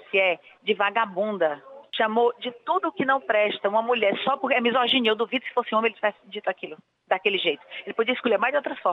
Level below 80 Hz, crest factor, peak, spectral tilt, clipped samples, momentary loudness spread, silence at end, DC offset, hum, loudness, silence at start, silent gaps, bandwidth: -82 dBFS; 18 dB; -6 dBFS; -6 dB/octave; under 0.1%; 9 LU; 0 s; under 0.1%; none; -24 LUFS; 0.15 s; none; 5.6 kHz